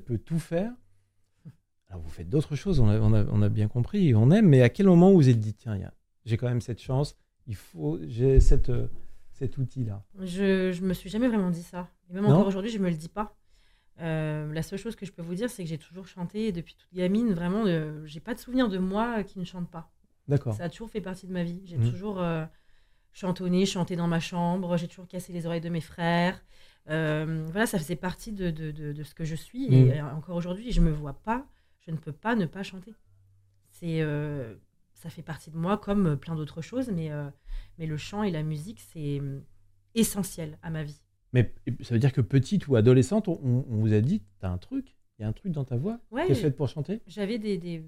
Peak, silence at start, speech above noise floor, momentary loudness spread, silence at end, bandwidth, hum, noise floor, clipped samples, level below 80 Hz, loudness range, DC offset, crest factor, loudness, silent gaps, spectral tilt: -6 dBFS; 0 s; 40 dB; 16 LU; 0 s; 15 kHz; none; -66 dBFS; under 0.1%; -38 dBFS; 11 LU; under 0.1%; 20 dB; -28 LUFS; none; -7.5 dB/octave